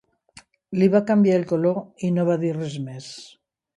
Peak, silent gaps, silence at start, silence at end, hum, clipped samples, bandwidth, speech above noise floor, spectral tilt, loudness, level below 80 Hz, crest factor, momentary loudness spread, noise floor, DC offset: -6 dBFS; none; 0.7 s; 0.5 s; none; under 0.1%; 11 kHz; 31 dB; -8 dB/octave; -22 LUFS; -66 dBFS; 16 dB; 17 LU; -52 dBFS; under 0.1%